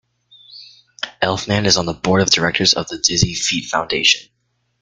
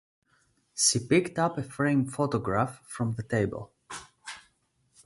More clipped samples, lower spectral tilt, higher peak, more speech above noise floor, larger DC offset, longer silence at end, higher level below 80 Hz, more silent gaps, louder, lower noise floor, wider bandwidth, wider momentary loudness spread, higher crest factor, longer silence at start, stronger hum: neither; about the same, -3 dB/octave vs -4 dB/octave; first, 0 dBFS vs -10 dBFS; second, 31 dB vs 43 dB; neither; about the same, 0.6 s vs 0.65 s; first, -46 dBFS vs -58 dBFS; neither; first, -16 LUFS vs -27 LUFS; second, -48 dBFS vs -70 dBFS; about the same, 11 kHz vs 11.5 kHz; second, 6 LU vs 19 LU; about the same, 18 dB vs 20 dB; second, 0.5 s vs 0.75 s; first, 60 Hz at -45 dBFS vs none